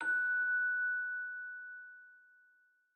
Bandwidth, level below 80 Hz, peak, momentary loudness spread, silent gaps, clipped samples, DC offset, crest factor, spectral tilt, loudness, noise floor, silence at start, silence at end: 8.8 kHz; under -90 dBFS; -28 dBFS; 19 LU; none; under 0.1%; under 0.1%; 10 dB; -1.5 dB/octave; -34 LUFS; -71 dBFS; 0 s; 0.8 s